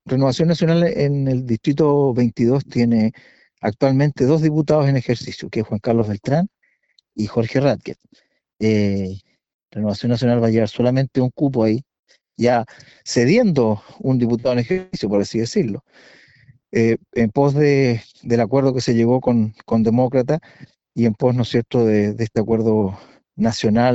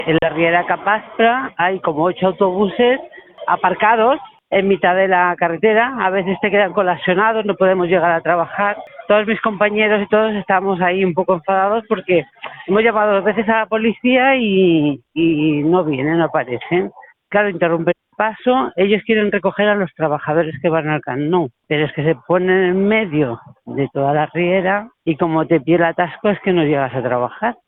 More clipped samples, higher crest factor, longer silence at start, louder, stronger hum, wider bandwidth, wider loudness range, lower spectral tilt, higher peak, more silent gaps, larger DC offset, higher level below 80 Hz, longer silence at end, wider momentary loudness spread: neither; about the same, 16 dB vs 16 dB; about the same, 0.05 s vs 0 s; second, -19 LUFS vs -16 LUFS; neither; first, 8.2 kHz vs 4 kHz; about the same, 4 LU vs 2 LU; second, -7.5 dB/octave vs -11 dB/octave; about the same, -2 dBFS vs 0 dBFS; first, 9.54-9.59 s, 11.99-12.03 s vs none; neither; about the same, -50 dBFS vs -54 dBFS; second, 0 s vs 0.15 s; first, 9 LU vs 6 LU